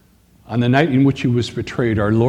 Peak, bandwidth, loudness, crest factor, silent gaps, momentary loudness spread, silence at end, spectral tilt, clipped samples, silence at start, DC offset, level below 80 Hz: 0 dBFS; 10 kHz; -17 LUFS; 16 dB; none; 8 LU; 0 s; -7.5 dB/octave; under 0.1%; 0.5 s; under 0.1%; -46 dBFS